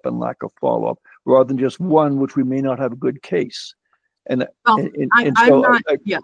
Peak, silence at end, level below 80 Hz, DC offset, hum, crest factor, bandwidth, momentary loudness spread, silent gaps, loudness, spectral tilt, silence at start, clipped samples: 0 dBFS; 0 s; -64 dBFS; under 0.1%; none; 18 dB; 9.8 kHz; 13 LU; none; -17 LUFS; -6.5 dB/octave; 0.05 s; under 0.1%